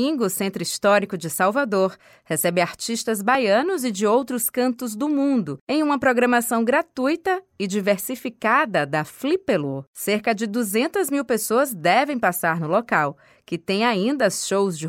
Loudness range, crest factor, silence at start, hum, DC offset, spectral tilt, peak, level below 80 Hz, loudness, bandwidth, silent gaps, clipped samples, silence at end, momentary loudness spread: 2 LU; 16 dB; 0 s; none; under 0.1%; -4 dB/octave; -4 dBFS; -66 dBFS; -22 LUFS; 17 kHz; 5.61-5.67 s, 9.87-9.93 s; under 0.1%; 0 s; 6 LU